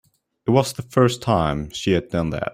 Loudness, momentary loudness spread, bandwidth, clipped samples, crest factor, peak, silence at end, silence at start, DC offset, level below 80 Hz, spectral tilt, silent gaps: -21 LUFS; 6 LU; 16 kHz; under 0.1%; 18 dB; -2 dBFS; 0 s; 0.45 s; under 0.1%; -44 dBFS; -6 dB/octave; none